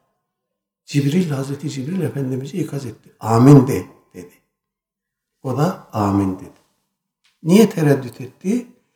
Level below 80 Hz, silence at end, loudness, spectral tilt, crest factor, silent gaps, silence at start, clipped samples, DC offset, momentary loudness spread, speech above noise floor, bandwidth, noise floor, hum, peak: -58 dBFS; 0.3 s; -18 LUFS; -7.5 dB/octave; 20 dB; none; 0.9 s; under 0.1%; under 0.1%; 17 LU; 66 dB; 18 kHz; -83 dBFS; none; 0 dBFS